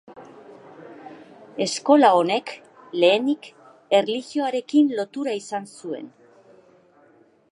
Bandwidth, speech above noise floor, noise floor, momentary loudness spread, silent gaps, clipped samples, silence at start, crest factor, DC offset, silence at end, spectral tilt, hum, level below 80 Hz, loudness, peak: 11.5 kHz; 36 dB; -56 dBFS; 25 LU; none; under 0.1%; 0.1 s; 20 dB; under 0.1%; 1.45 s; -4 dB/octave; none; -80 dBFS; -21 LUFS; -2 dBFS